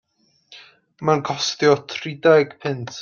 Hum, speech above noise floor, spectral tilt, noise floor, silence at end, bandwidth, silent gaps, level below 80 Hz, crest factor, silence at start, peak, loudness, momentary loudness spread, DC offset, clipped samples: none; 36 dB; -4.5 dB/octave; -55 dBFS; 0 s; 7.4 kHz; none; -66 dBFS; 18 dB; 0.5 s; -2 dBFS; -20 LUFS; 11 LU; under 0.1%; under 0.1%